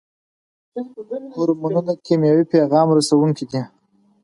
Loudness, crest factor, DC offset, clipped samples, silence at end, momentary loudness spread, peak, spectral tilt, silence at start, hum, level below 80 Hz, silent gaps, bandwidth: -18 LUFS; 16 dB; under 0.1%; under 0.1%; 0.55 s; 16 LU; -2 dBFS; -6.5 dB/octave; 0.75 s; none; -66 dBFS; none; 11.5 kHz